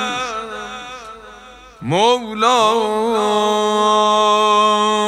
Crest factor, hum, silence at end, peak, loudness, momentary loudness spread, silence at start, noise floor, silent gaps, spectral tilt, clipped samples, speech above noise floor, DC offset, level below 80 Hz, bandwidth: 16 dB; none; 0 s; 0 dBFS; -15 LUFS; 17 LU; 0 s; -40 dBFS; none; -3.5 dB/octave; under 0.1%; 25 dB; under 0.1%; -54 dBFS; 14 kHz